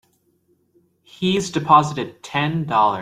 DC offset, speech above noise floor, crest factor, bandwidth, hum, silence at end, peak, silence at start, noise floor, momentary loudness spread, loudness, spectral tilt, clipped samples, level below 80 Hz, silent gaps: under 0.1%; 45 dB; 20 dB; 14.5 kHz; none; 0 s; 0 dBFS; 1.2 s; -63 dBFS; 10 LU; -19 LUFS; -5 dB/octave; under 0.1%; -58 dBFS; none